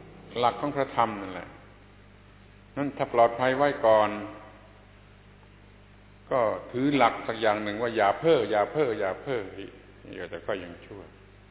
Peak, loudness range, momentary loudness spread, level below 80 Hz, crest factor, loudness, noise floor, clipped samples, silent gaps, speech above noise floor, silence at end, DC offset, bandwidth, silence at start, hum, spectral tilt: -6 dBFS; 4 LU; 20 LU; -58 dBFS; 22 dB; -26 LUFS; -53 dBFS; under 0.1%; none; 26 dB; 0.4 s; under 0.1%; 4 kHz; 0 s; 50 Hz at -55 dBFS; -9.5 dB/octave